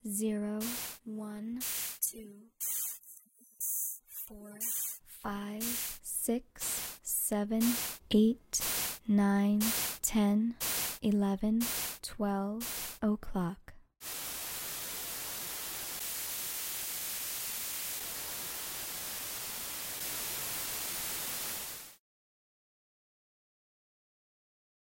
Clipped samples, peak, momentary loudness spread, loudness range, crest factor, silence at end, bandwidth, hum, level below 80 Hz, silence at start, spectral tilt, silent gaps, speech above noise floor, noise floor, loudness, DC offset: under 0.1%; -16 dBFS; 10 LU; 7 LU; 20 dB; 3.05 s; 16.5 kHz; none; -60 dBFS; 0.05 s; -3.5 dB/octave; none; 27 dB; -58 dBFS; -34 LUFS; under 0.1%